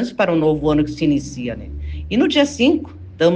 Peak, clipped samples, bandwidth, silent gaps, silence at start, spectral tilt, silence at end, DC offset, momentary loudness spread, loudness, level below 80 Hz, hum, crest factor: -2 dBFS; under 0.1%; 8.8 kHz; none; 0 s; -6 dB/octave; 0 s; under 0.1%; 14 LU; -18 LUFS; -36 dBFS; none; 14 dB